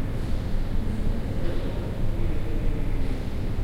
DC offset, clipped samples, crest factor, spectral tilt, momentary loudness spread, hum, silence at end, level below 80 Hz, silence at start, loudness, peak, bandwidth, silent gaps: under 0.1%; under 0.1%; 12 dB; -7.5 dB/octave; 1 LU; none; 0 s; -26 dBFS; 0 s; -31 LUFS; -12 dBFS; 5.8 kHz; none